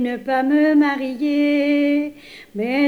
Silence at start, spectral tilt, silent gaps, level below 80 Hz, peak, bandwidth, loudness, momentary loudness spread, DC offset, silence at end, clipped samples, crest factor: 0 s; -6 dB/octave; none; -60 dBFS; -6 dBFS; 6.2 kHz; -18 LUFS; 10 LU; under 0.1%; 0 s; under 0.1%; 12 dB